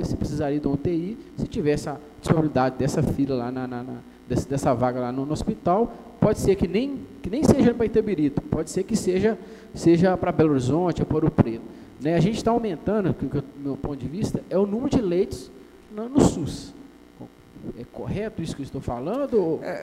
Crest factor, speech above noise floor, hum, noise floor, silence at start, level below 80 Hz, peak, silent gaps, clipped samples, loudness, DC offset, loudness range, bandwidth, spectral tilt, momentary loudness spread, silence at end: 20 dB; 22 dB; none; -45 dBFS; 0 s; -44 dBFS; -2 dBFS; none; under 0.1%; -24 LUFS; under 0.1%; 6 LU; 15.5 kHz; -7 dB/octave; 14 LU; 0 s